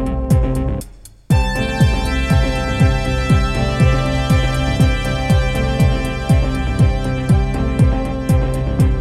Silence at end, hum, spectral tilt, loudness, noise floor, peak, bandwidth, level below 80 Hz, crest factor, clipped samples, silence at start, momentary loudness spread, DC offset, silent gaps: 0 s; none; -6.5 dB/octave; -17 LUFS; -36 dBFS; -2 dBFS; 14 kHz; -20 dBFS; 14 dB; under 0.1%; 0 s; 4 LU; under 0.1%; none